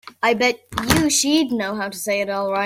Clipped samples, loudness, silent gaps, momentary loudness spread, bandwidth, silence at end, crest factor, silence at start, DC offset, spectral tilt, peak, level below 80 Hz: under 0.1%; -19 LUFS; none; 8 LU; 16.5 kHz; 0 s; 20 dB; 0.05 s; under 0.1%; -3 dB/octave; 0 dBFS; -44 dBFS